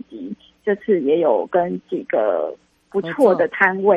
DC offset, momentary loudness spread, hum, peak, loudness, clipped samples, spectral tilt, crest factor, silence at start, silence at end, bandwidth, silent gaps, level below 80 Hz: under 0.1%; 12 LU; none; -2 dBFS; -19 LUFS; under 0.1%; -7.5 dB/octave; 18 dB; 0.1 s; 0 s; 12.5 kHz; none; -66 dBFS